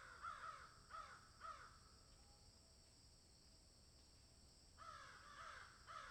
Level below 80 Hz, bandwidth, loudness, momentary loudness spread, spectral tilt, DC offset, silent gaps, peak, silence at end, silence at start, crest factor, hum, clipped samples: -74 dBFS; 14 kHz; -60 LUFS; 13 LU; -2.5 dB/octave; under 0.1%; none; -42 dBFS; 0 s; 0 s; 18 dB; none; under 0.1%